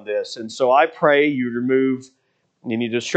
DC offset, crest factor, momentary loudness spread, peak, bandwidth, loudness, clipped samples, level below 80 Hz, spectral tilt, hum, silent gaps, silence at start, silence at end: under 0.1%; 18 dB; 13 LU; -2 dBFS; 8.8 kHz; -19 LUFS; under 0.1%; -72 dBFS; -5 dB/octave; none; none; 0 s; 0 s